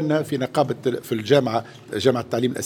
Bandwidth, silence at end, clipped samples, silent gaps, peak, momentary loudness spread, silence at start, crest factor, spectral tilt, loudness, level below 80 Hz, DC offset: 18 kHz; 0 s; under 0.1%; none; -2 dBFS; 8 LU; 0 s; 20 dB; -6 dB/octave; -22 LUFS; -62 dBFS; under 0.1%